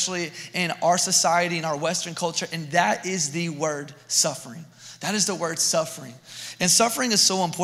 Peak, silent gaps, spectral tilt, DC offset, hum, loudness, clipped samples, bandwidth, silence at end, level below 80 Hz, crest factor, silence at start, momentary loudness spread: -6 dBFS; none; -2 dB/octave; under 0.1%; none; -22 LUFS; under 0.1%; 16 kHz; 0 s; -72 dBFS; 18 dB; 0 s; 18 LU